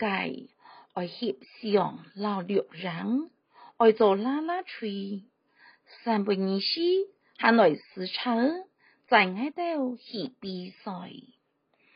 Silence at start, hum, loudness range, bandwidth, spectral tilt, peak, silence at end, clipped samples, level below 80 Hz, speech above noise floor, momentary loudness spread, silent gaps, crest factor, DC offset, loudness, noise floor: 0 s; none; 5 LU; 5.2 kHz; -3.5 dB/octave; -6 dBFS; 0.75 s; under 0.1%; -80 dBFS; 43 dB; 16 LU; none; 22 dB; under 0.1%; -28 LUFS; -71 dBFS